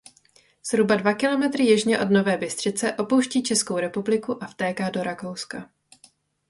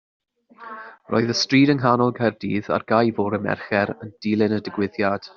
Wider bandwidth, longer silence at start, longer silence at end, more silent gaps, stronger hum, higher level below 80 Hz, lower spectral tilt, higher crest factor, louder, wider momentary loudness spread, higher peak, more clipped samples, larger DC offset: first, 11.5 kHz vs 7.2 kHz; about the same, 0.65 s vs 0.6 s; first, 0.85 s vs 0.1 s; neither; neither; second, -66 dBFS vs -60 dBFS; about the same, -4 dB/octave vs -4.5 dB/octave; about the same, 18 dB vs 18 dB; about the same, -23 LUFS vs -21 LUFS; about the same, 12 LU vs 12 LU; second, -6 dBFS vs -2 dBFS; neither; neither